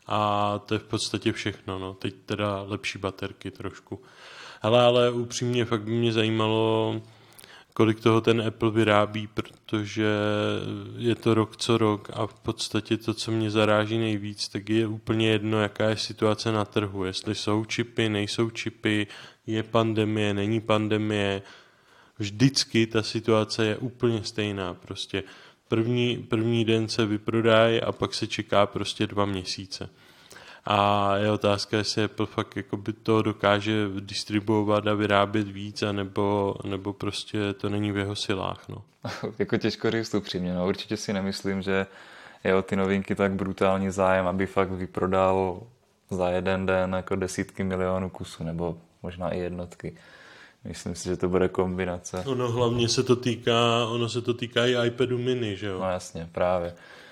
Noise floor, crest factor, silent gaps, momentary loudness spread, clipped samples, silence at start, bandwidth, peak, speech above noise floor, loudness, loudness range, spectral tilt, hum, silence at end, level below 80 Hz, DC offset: -58 dBFS; 24 dB; none; 12 LU; under 0.1%; 0.1 s; 13.5 kHz; -2 dBFS; 32 dB; -26 LUFS; 5 LU; -5.5 dB/octave; none; 0 s; -62 dBFS; under 0.1%